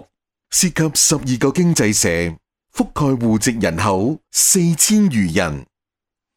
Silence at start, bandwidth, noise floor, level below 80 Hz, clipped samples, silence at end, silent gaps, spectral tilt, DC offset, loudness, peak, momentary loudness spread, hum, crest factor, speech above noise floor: 0.5 s; 18 kHz; -85 dBFS; -42 dBFS; under 0.1%; 0.7 s; none; -4 dB/octave; under 0.1%; -16 LUFS; -2 dBFS; 10 LU; none; 16 dB; 69 dB